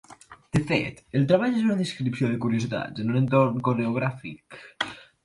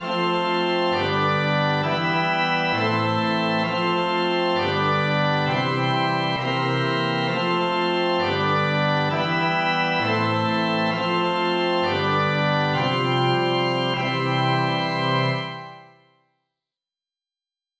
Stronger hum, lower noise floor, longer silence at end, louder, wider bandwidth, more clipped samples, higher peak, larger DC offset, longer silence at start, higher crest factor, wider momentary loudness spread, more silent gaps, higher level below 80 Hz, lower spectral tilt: neither; second, -49 dBFS vs under -90 dBFS; second, 0.2 s vs 1.95 s; second, -25 LUFS vs -21 LUFS; first, 11.5 kHz vs 8 kHz; neither; about the same, -8 dBFS vs -10 dBFS; neither; about the same, 0.1 s vs 0 s; first, 18 dB vs 12 dB; first, 11 LU vs 2 LU; neither; about the same, -58 dBFS vs -56 dBFS; about the same, -7 dB/octave vs -6.5 dB/octave